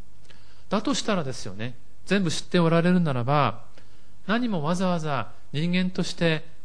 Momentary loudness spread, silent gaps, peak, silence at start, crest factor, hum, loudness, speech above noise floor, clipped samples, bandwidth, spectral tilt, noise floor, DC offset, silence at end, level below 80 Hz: 13 LU; none; -8 dBFS; 0.7 s; 16 dB; none; -25 LUFS; 30 dB; under 0.1%; 10.5 kHz; -6 dB/octave; -55 dBFS; 3%; 0.25 s; -54 dBFS